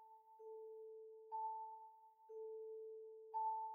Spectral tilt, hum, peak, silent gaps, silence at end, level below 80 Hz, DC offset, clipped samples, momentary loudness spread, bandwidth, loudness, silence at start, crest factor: -2 dB/octave; none; -36 dBFS; none; 0 s; under -90 dBFS; under 0.1%; under 0.1%; 16 LU; 1.9 kHz; -51 LUFS; 0 s; 14 dB